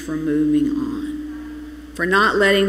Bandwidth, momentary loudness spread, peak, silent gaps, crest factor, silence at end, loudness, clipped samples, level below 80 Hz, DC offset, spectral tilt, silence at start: 15 kHz; 19 LU; -4 dBFS; none; 16 dB; 0 s; -19 LUFS; under 0.1%; -42 dBFS; under 0.1%; -5 dB/octave; 0 s